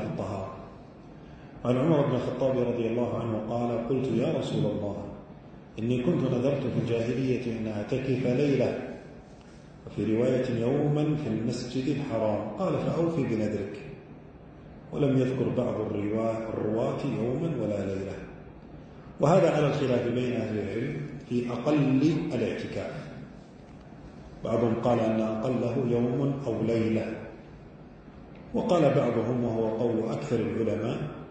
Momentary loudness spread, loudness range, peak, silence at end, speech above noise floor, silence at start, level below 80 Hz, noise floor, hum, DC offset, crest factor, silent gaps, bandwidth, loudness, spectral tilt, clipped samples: 22 LU; 3 LU; -8 dBFS; 0 s; 21 dB; 0 s; -56 dBFS; -48 dBFS; none; under 0.1%; 20 dB; none; 9 kHz; -28 LUFS; -8 dB/octave; under 0.1%